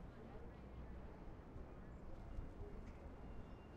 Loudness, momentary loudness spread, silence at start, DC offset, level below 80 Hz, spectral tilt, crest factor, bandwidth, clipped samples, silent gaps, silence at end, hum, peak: -57 LUFS; 2 LU; 0 s; under 0.1%; -56 dBFS; -8 dB/octave; 16 dB; 8.6 kHz; under 0.1%; none; 0 s; none; -38 dBFS